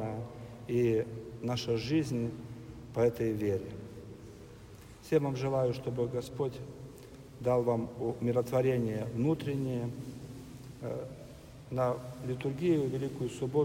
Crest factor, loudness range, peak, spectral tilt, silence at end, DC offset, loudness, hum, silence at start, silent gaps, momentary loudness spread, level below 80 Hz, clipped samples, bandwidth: 18 dB; 4 LU; -14 dBFS; -7.5 dB/octave; 0 s; under 0.1%; -33 LUFS; none; 0 s; none; 19 LU; -58 dBFS; under 0.1%; 16 kHz